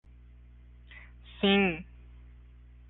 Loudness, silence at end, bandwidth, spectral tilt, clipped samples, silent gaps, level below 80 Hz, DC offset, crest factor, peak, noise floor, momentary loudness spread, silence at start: -27 LUFS; 1.05 s; 4.1 kHz; -3.5 dB/octave; under 0.1%; none; -52 dBFS; under 0.1%; 20 dB; -14 dBFS; -53 dBFS; 26 LU; 0.9 s